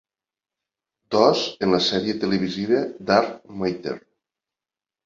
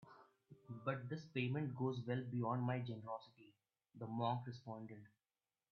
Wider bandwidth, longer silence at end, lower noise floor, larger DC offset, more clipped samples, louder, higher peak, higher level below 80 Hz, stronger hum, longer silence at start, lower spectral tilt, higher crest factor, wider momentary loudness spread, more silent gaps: first, 7.6 kHz vs 6.6 kHz; first, 1.1 s vs 0.65 s; about the same, under -90 dBFS vs under -90 dBFS; neither; neither; first, -22 LUFS vs -44 LUFS; first, -2 dBFS vs -26 dBFS; first, -60 dBFS vs -84 dBFS; neither; first, 1.1 s vs 0 s; second, -5 dB/octave vs -6.5 dB/octave; about the same, 22 dB vs 20 dB; second, 11 LU vs 15 LU; neither